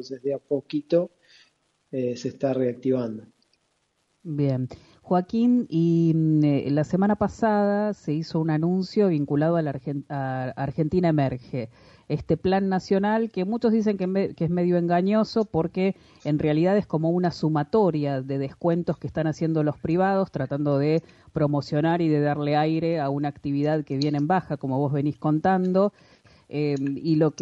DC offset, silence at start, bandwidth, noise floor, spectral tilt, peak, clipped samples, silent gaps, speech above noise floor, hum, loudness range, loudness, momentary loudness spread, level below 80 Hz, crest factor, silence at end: under 0.1%; 0 s; 7.8 kHz; -71 dBFS; -8.5 dB/octave; -10 dBFS; under 0.1%; none; 48 dB; none; 5 LU; -24 LUFS; 8 LU; -56 dBFS; 14 dB; 0 s